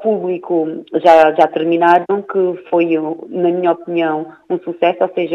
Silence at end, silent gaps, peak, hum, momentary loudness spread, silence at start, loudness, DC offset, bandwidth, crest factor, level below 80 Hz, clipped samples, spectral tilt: 0 s; none; 0 dBFS; none; 11 LU; 0 s; -15 LUFS; under 0.1%; 7.2 kHz; 14 dB; -64 dBFS; under 0.1%; -7 dB/octave